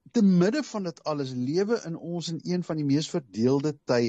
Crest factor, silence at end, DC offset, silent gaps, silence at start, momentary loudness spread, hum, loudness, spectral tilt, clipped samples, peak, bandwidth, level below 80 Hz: 14 dB; 0 s; under 0.1%; none; 0.15 s; 10 LU; none; -27 LUFS; -6.5 dB/octave; under 0.1%; -12 dBFS; 8.4 kHz; -70 dBFS